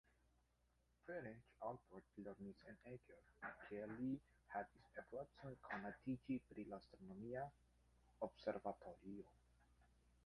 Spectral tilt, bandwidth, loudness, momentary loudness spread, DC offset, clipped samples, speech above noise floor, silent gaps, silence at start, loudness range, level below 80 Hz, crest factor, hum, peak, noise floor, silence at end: -8 dB/octave; 11 kHz; -53 LUFS; 11 LU; under 0.1%; under 0.1%; 29 dB; none; 1.05 s; 5 LU; -76 dBFS; 22 dB; 60 Hz at -75 dBFS; -32 dBFS; -82 dBFS; 0.15 s